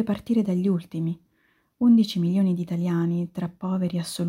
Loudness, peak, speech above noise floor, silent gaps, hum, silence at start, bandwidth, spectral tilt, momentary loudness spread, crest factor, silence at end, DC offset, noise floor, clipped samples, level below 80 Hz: -24 LUFS; -10 dBFS; 44 dB; none; none; 0 s; 16 kHz; -7.5 dB/octave; 11 LU; 14 dB; 0 s; under 0.1%; -67 dBFS; under 0.1%; -62 dBFS